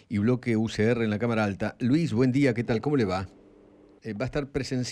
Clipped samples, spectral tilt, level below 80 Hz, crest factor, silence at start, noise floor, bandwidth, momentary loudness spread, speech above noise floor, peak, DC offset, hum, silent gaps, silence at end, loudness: under 0.1%; -7 dB/octave; -52 dBFS; 14 dB; 0.1 s; -55 dBFS; 10.5 kHz; 9 LU; 29 dB; -12 dBFS; under 0.1%; none; none; 0 s; -26 LUFS